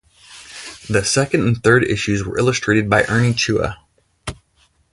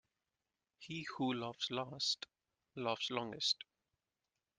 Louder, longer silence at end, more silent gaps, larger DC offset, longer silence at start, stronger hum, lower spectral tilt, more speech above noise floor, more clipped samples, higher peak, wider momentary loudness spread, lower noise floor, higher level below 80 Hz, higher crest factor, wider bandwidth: first, -17 LUFS vs -40 LUFS; second, 0.6 s vs 0.95 s; neither; neither; second, 0.3 s vs 0.8 s; neither; first, -5 dB/octave vs -3 dB/octave; second, 43 dB vs over 49 dB; neither; first, 0 dBFS vs -22 dBFS; about the same, 18 LU vs 17 LU; second, -59 dBFS vs under -90 dBFS; first, -42 dBFS vs -82 dBFS; about the same, 18 dB vs 20 dB; first, 11.5 kHz vs 10 kHz